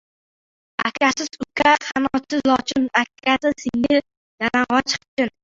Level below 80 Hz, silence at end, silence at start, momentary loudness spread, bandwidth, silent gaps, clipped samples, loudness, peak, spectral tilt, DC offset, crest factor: -54 dBFS; 0.15 s; 0.8 s; 8 LU; 7.8 kHz; 4.17-4.38 s, 5.08-5.17 s; under 0.1%; -20 LUFS; -2 dBFS; -3 dB/octave; under 0.1%; 20 dB